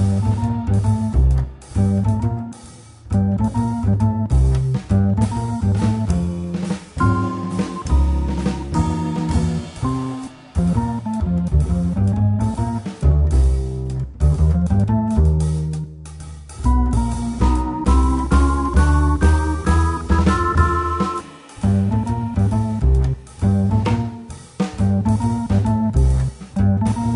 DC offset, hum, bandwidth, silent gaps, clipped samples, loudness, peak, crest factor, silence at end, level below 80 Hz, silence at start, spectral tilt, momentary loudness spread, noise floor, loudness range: under 0.1%; none; 11 kHz; none; under 0.1%; -19 LUFS; -2 dBFS; 16 dB; 0 s; -22 dBFS; 0 s; -8 dB/octave; 8 LU; -40 dBFS; 3 LU